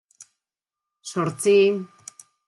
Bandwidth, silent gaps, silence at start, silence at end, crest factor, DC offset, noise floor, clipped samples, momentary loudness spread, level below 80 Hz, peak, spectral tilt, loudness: 12.5 kHz; none; 0.2 s; 0.65 s; 16 dB; under 0.1%; -88 dBFS; under 0.1%; 24 LU; -74 dBFS; -8 dBFS; -5 dB/octave; -21 LUFS